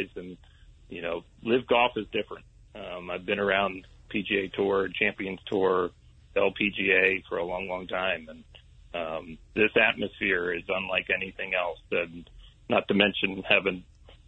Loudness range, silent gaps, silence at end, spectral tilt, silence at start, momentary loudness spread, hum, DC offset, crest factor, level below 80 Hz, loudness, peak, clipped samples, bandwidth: 3 LU; none; 0.1 s; -6.5 dB/octave; 0 s; 16 LU; none; under 0.1%; 24 dB; -56 dBFS; -27 LUFS; -4 dBFS; under 0.1%; 8.2 kHz